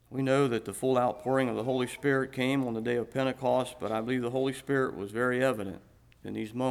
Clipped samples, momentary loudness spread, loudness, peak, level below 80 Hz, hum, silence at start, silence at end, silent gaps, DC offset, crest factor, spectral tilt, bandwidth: under 0.1%; 9 LU; -30 LUFS; -14 dBFS; -64 dBFS; none; 0.1 s; 0 s; none; under 0.1%; 16 dB; -6 dB/octave; 15 kHz